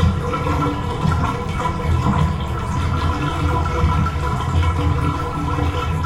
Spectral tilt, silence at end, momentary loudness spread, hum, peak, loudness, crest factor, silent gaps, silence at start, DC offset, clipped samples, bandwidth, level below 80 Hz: -7 dB/octave; 0 s; 4 LU; none; -4 dBFS; -20 LUFS; 14 dB; none; 0 s; under 0.1%; under 0.1%; 12 kHz; -28 dBFS